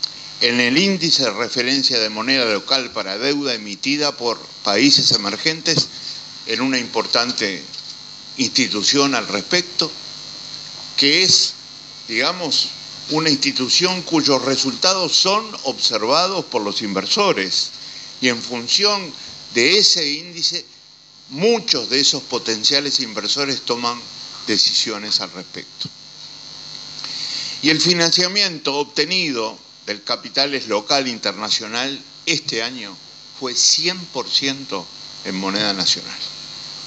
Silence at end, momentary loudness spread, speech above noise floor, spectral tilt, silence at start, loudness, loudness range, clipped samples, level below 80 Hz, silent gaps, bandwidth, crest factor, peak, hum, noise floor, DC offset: 0 s; 16 LU; 27 dB; -2 dB/octave; 0 s; -17 LUFS; 4 LU; under 0.1%; -66 dBFS; none; 9.2 kHz; 20 dB; 0 dBFS; none; -46 dBFS; under 0.1%